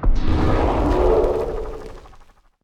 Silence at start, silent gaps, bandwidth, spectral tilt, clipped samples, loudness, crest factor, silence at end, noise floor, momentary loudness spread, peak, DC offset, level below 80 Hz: 0 s; none; 8 kHz; -8 dB/octave; under 0.1%; -20 LUFS; 14 dB; 0.55 s; -48 dBFS; 16 LU; -4 dBFS; under 0.1%; -22 dBFS